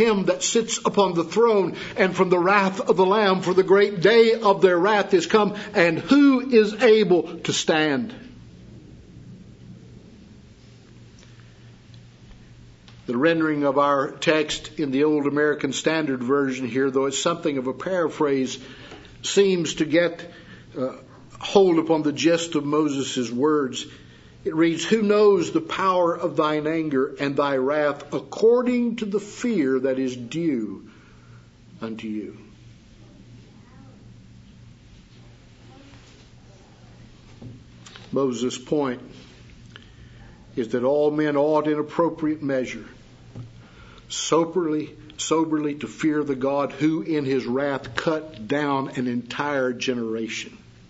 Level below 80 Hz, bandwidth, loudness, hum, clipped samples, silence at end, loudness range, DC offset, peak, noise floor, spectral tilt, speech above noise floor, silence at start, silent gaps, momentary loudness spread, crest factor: -58 dBFS; 8 kHz; -22 LUFS; none; under 0.1%; 0.35 s; 11 LU; under 0.1%; -2 dBFS; -48 dBFS; -4.5 dB/octave; 27 dB; 0 s; none; 14 LU; 20 dB